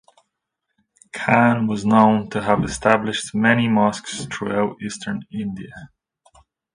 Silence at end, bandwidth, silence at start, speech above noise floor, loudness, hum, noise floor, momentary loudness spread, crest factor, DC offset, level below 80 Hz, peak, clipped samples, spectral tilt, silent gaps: 0.9 s; 10.5 kHz; 1.15 s; 59 dB; -19 LUFS; none; -78 dBFS; 13 LU; 20 dB; under 0.1%; -50 dBFS; 0 dBFS; under 0.1%; -5.5 dB/octave; none